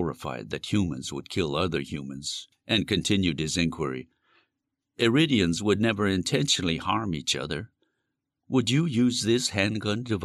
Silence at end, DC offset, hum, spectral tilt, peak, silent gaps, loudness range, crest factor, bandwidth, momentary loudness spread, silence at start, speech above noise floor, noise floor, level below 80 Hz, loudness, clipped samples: 0 s; under 0.1%; none; -4.5 dB/octave; -10 dBFS; none; 3 LU; 18 dB; 13.5 kHz; 11 LU; 0 s; 57 dB; -83 dBFS; -54 dBFS; -26 LUFS; under 0.1%